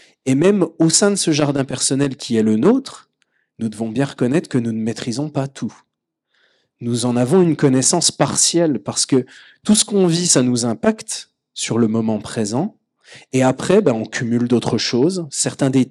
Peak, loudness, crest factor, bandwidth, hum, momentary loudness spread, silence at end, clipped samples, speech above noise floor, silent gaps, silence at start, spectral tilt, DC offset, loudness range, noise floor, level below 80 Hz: 0 dBFS; -17 LUFS; 18 dB; 14 kHz; none; 11 LU; 0 s; under 0.1%; 54 dB; none; 0.25 s; -4.5 dB/octave; under 0.1%; 7 LU; -71 dBFS; -58 dBFS